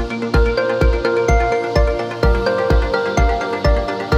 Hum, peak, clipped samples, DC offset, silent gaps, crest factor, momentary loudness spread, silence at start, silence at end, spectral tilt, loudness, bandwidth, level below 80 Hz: none; -2 dBFS; under 0.1%; under 0.1%; none; 14 dB; 3 LU; 0 s; 0 s; -6.5 dB/octave; -17 LUFS; 8.6 kHz; -20 dBFS